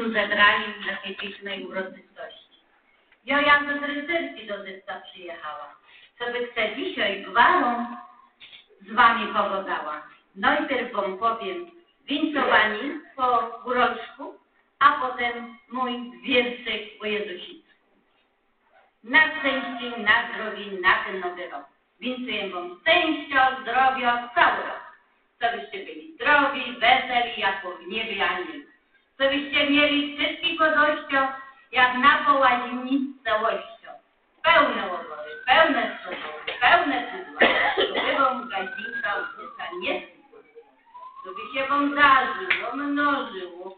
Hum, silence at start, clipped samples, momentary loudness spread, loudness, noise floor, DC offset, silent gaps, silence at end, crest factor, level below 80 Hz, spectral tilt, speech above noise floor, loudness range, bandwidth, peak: none; 0 s; under 0.1%; 18 LU; -23 LUFS; -67 dBFS; under 0.1%; none; 0.05 s; 22 dB; -60 dBFS; -7 dB/octave; 43 dB; 5 LU; 4.7 kHz; -4 dBFS